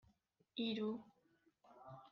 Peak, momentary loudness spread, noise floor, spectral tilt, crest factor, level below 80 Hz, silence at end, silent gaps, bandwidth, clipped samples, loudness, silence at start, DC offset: -32 dBFS; 18 LU; -78 dBFS; -7 dB/octave; 16 dB; -86 dBFS; 0.05 s; none; 6.2 kHz; under 0.1%; -44 LUFS; 0.55 s; under 0.1%